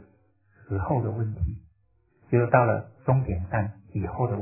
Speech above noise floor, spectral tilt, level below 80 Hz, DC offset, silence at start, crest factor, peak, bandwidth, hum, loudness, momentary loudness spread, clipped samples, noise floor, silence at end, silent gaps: 41 dB; -14.5 dB/octave; -40 dBFS; under 0.1%; 0 s; 24 dB; -4 dBFS; 2.8 kHz; none; -27 LUFS; 11 LU; under 0.1%; -66 dBFS; 0 s; none